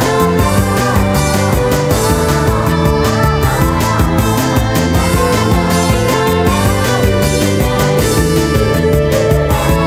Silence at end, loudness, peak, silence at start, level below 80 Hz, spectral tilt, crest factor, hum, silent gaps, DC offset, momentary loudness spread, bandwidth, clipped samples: 0 s; -12 LUFS; 0 dBFS; 0 s; -20 dBFS; -5.5 dB/octave; 12 dB; none; none; under 0.1%; 1 LU; 16.5 kHz; under 0.1%